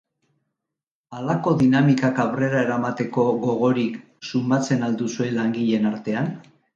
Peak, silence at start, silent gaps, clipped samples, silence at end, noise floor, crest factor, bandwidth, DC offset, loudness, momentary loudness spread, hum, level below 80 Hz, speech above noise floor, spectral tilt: -6 dBFS; 1.1 s; none; under 0.1%; 0.35 s; -86 dBFS; 16 dB; 7.6 kHz; under 0.1%; -22 LUFS; 10 LU; none; -62 dBFS; 65 dB; -7 dB/octave